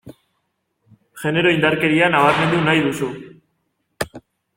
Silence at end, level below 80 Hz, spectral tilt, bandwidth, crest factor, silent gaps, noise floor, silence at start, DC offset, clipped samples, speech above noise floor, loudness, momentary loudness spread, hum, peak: 0.35 s; -54 dBFS; -5.5 dB/octave; 16.5 kHz; 18 dB; none; -71 dBFS; 0.05 s; under 0.1%; under 0.1%; 55 dB; -17 LUFS; 15 LU; none; -2 dBFS